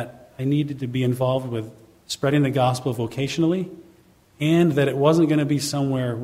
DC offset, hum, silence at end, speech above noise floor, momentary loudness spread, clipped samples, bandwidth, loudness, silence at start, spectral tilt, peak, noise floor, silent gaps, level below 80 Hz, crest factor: under 0.1%; none; 0 s; 33 dB; 12 LU; under 0.1%; 16 kHz; -22 LUFS; 0 s; -6.5 dB/octave; -4 dBFS; -54 dBFS; none; -58 dBFS; 18 dB